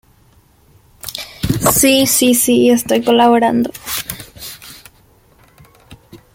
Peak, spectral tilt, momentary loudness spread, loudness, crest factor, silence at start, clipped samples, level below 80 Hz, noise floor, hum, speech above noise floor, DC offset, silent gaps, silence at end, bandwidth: 0 dBFS; -3.5 dB/octave; 20 LU; -12 LUFS; 16 dB; 1.05 s; under 0.1%; -42 dBFS; -51 dBFS; none; 39 dB; under 0.1%; none; 0.2 s; 17 kHz